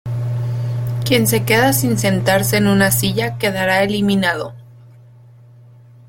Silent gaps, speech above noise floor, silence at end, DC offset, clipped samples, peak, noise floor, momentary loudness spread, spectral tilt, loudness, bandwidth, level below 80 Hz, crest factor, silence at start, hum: none; 28 dB; 1.45 s; under 0.1%; under 0.1%; -2 dBFS; -43 dBFS; 8 LU; -4.5 dB/octave; -16 LUFS; 17 kHz; -46 dBFS; 16 dB; 0.05 s; none